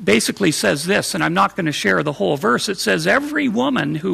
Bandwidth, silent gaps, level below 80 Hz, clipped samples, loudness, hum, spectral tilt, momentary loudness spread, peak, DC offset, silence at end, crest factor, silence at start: 15.5 kHz; none; -54 dBFS; under 0.1%; -18 LUFS; none; -4 dB/octave; 3 LU; -2 dBFS; under 0.1%; 0 s; 16 dB; 0 s